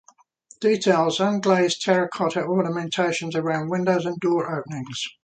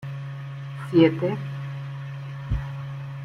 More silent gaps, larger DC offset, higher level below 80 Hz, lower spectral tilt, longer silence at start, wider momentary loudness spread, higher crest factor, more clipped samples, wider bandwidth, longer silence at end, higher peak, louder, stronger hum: neither; neither; second, -68 dBFS vs -42 dBFS; second, -5 dB/octave vs -8.5 dB/octave; first, 0.6 s vs 0 s; second, 7 LU vs 16 LU; about the same, 18 dB vs 20 dB; neither; first, 9.4 kHz vs 6.6 kHz; first, 0.15 s vs 0 s; about the same, -4 dBFS vs -6 dBFS; first, -23 LUFS vs -27 LUFS; neither